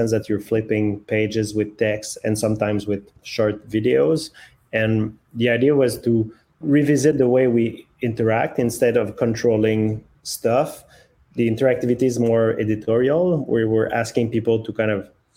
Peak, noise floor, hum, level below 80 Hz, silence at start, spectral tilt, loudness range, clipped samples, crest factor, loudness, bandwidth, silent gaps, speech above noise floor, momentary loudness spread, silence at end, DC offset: -4 dBFS; -53 dBFS; none; -54 dBFS; 0 s; -6.5 dB/octave; 3 LU; under 0.1%; 16 dB; -20 LUFS; 16.5 kHz; none; 33 dB; 9 LU; 0.3 s; under 0.1%